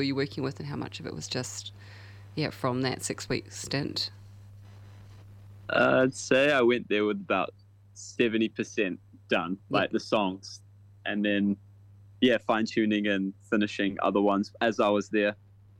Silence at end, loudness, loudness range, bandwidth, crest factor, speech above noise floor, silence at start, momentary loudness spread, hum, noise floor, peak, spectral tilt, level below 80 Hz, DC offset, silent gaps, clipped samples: 0.45 s; -28 LUFS; 7 LU; 16 kHz; 20 dB; 25 dB; 0 s; 15 LU; none; -53 dBFS; -8 dBFS; -5 dB/octave; -64 dBFS; under 0.1%; none; under 0.1%